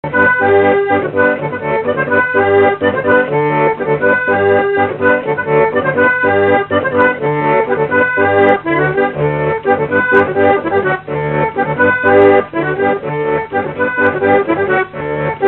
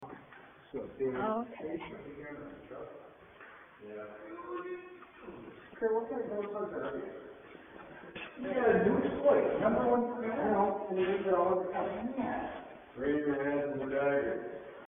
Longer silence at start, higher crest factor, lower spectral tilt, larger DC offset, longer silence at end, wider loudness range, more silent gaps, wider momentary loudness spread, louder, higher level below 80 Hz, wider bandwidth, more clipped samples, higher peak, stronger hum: about the same, 0.05 s vs 0 s; second, 12 dB vs 20 dB; first, -9.5 dB/octave vs -2.5 dB/octave; neither; about the same, 0 s vs 0 s; second, 1 LU vs 16 LU; neither; second, 6 LU vs 22 LU; first, -13 LUFS vs -33 LUFS; first, -46 dBFS vs -64 dBFS; first, 4.2 kHz vs 3.7 kHz; neither; first, 0 dBFS vs -14 dBFS; neither